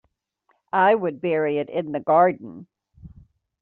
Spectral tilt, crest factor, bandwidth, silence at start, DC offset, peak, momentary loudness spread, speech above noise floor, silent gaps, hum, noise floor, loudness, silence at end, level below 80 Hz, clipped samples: -4.5 dB/octave; 18 dB; 4.2 kHz; 0.75 s; under 0.1%; -6 dBFS; 9 LU; 48 dB; none; none; -69 dBFS; -21 LUFS; 0.55 s; -62 dBFS; under 0.1%